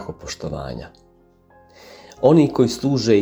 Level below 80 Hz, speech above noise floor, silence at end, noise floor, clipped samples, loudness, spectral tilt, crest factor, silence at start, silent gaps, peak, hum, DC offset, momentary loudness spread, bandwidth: -46 dBFS; 36 dB; 0 s; -54 dBFS; under 0.1%; -19 LUFS; -6.5 dB/octave; 18 dB; 0 s; none; -2 dBFS; none; under 0.1%; 17 LU; over 20 kHz